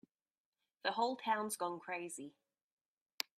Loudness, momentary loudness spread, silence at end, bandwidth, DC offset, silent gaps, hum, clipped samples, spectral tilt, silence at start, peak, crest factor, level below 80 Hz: -40 LUFS; 11 LU; 1.1 s; 15.5 kHz; under 0.1%; none; none; under 0.1%; -2 dB/octave; 0.85 s; -16 dBFS; 28 dB; under -90 dBFS